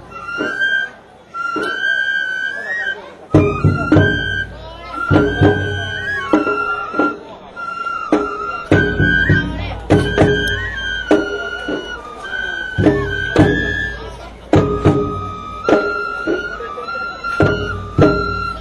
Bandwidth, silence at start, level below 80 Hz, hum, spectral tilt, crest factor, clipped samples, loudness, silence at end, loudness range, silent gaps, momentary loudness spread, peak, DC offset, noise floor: 11.5 kHz; 0 s; -34 dBFS; none; -6.5 dB/octave; 16 dB; under 0.1%; -17 LUFS; 0 s; 3 LU; none; 12 LU; 0 dBFS; under 0.1%; -37 dBFS